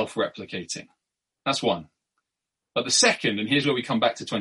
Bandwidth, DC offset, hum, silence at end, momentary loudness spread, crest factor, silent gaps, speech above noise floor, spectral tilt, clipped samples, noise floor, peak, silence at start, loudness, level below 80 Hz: 11.5 kHz; under 0.1%; none; 0 s; 14 LU; 22 dB; none; 61 dB; -2.5 dB/octave; under 0.1%; -86 dBFS; -4 dBFS; 0 s; -24 LUFS; -68 dBFS